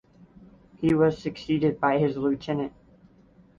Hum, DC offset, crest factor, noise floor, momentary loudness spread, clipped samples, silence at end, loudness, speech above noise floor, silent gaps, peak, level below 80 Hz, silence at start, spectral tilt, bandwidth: none; under 0.1%; 18 dB; -56 dBFS; 9 LU; under 0.1%; 0.9 s; -25 LUFS; 32 dB; none; -8 dBFS; -56 dBFS; 0.8 s; -8 dB/octave; 7.4 kHz